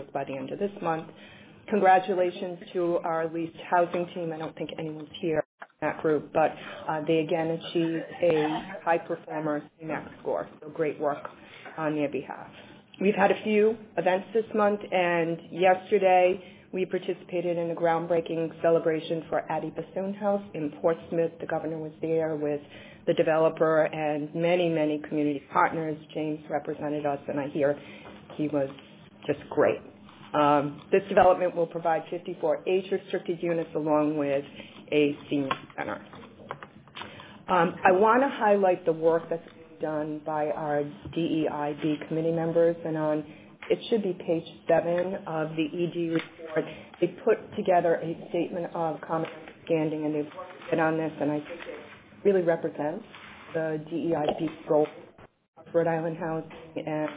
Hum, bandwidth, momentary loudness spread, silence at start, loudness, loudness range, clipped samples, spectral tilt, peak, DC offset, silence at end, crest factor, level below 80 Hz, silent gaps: none; 4 kHz; 13 LU; 0 s; -28 LUFS; 5 LU; under 0.1%; -10 dB/octave; -6 dBFS; under 0.1%; 0 s; 22 dB; -66 dBFS; 5.45-5.58 s, 55.48-55.53 s